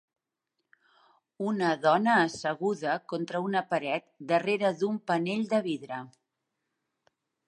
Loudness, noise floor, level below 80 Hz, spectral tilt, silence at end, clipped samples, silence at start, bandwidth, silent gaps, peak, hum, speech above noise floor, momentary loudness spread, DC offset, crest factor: -29 LUFS; -84 dBFS; -80 dBFS; -5.5 dB/octave; 1.4 s; under 0.1%; 1.4 s; 10.5 kHz; none; -12 dBFS; none; 56 dB; 10 LU; under 0.1%; 18 dB